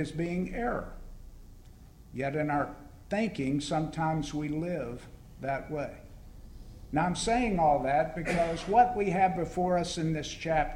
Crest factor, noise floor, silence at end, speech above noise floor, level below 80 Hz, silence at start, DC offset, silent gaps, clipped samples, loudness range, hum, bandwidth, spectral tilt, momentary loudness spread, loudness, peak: 20 dB; -52 dBFS; 0 s; 22 dB; -48 dBFS; 0 s; under 0.1%; none; under 0.1%; 7 LU; none; 16 kHz; -5.5 dB/octave; 15 LU; -30 LUFS; -10 dBFS